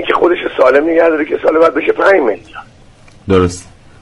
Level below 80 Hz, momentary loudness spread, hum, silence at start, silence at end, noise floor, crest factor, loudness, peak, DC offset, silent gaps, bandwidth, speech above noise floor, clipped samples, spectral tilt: -42 dBFS; 8 LU; none; 0 s; 0.4 s; -41 dBFS; 12 dB; -11 LUFS; 0 dBFS; under 0.1%; none; 11.5 kHz; 29 dB; under 0.1%; -6 dB/octave